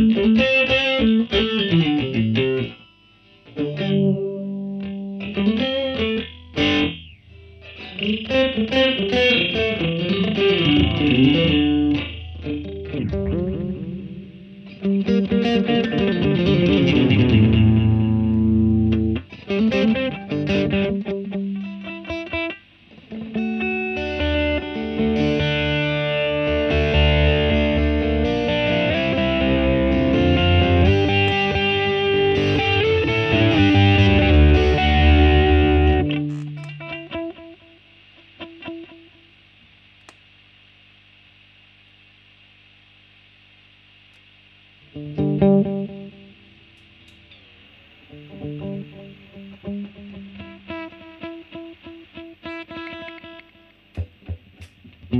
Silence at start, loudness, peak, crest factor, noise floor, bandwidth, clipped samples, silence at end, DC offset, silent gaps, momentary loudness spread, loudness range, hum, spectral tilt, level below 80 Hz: 0 s; -19 LUFS; -4 dBFS; 16 dB; -52 dBFS; 6.4 kHz; under 0.1%; 0 s; under 0.1%; none; 20 LU; 19 LU; 50 Hz at -45 dBFS; -7.5 dB/octave; -30 dBFS